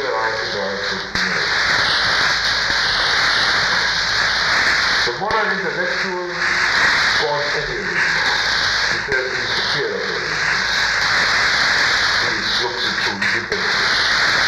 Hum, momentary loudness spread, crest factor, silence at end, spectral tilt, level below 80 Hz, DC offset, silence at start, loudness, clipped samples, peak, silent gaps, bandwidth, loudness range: none; 6 LU; 16 dB; 0 s; -1.5 dB/octave; -44 dBFS; under 0.1%; 0 s; -16 LUFS; under 0.1%; -2 dBFS; none; 15 kHz; 2 LU